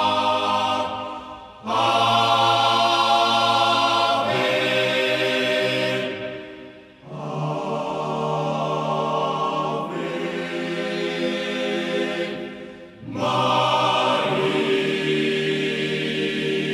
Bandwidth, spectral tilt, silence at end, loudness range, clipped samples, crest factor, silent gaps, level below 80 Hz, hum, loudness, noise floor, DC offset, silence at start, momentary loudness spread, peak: 14 kHz; -4.5 dB/octave; 0 s; 8 LU; under 0.1%; 16 dB; none; -62 dBFS; none; -21 LUFS; -42 dBFS; under 0.1%; 0 s; 14 LU; -6 dBFS